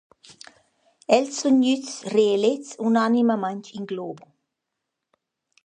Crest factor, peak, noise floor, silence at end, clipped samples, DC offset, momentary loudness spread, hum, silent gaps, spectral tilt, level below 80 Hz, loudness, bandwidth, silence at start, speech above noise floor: 22 dB; -2 dBFS; -82 dBFS; 1.45 s; under 0.1%; under 0.1%; 14 LU; none; none; -4.5 dB/octave; -74 dBFS; -22 LUFS; 10 kHz; 1.1 s; 60 dB